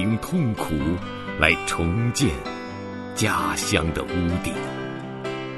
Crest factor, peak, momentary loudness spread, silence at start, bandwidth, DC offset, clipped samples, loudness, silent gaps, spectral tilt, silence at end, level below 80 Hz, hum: 24 dB; 0 dBFS; 11 LU; 0 s; 12.5 kHz; under 0.1%; under 0.1%; -24 LUFS; none; -4.5 dB/octave; 0 s; -40 dBFS; none